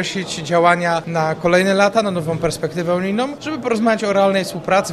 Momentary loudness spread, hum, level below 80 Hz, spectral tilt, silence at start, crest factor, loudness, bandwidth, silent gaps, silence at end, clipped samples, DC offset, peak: 7 LU; none; -48 dBFS; -5 dB/octave; 0 s; 16 dB; -17 LUFS; 14 kHz; none; 0 s; under 0.1%; under 0.1%; 0 dBFS